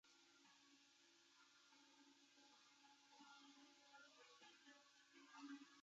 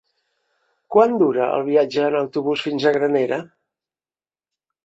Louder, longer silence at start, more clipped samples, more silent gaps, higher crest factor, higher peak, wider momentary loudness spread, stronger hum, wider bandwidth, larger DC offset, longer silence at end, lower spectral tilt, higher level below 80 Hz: second, -65 LUFS vs -19 LUFS; second, 0.05 s vs 0.9 s; neither; neither; about the same, 20 dB vs 18 dB; second, -48 dBFS vs -2 dBFS; first, 9 LU vs 6 LU; neither; about the same, 7.6 kHz vs 7.8 kHz; neither; second, 0 s vs 1.4 s; second, 0.5 dB/octave vs -6.5 dB/octave; second, under -90 dBFS vs -68 dBFS